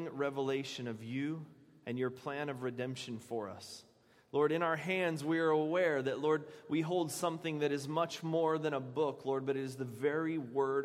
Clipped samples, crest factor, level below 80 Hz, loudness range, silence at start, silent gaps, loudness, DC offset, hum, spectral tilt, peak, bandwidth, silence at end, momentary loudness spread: under 0.1%; 18 dB; -82 dBFS; 7 LU; 0 s; none; -36 LUFS; under 0.1%; none; -5.5 dB/octave; -18 dBFS; 16 kHz; 0 s; 10 LU